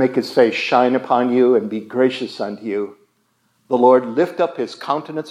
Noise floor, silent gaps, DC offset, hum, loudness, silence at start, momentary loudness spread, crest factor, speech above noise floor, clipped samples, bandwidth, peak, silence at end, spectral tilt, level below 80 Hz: -64 dBFS; none; under 0.1%; none; -18 LUFS; 0 s; 12 LU; 18 dB; 47 dB; under 0.1%; 13 kHz; 0 dBFS; 0 s; -6 dB/octave; -80 dBFS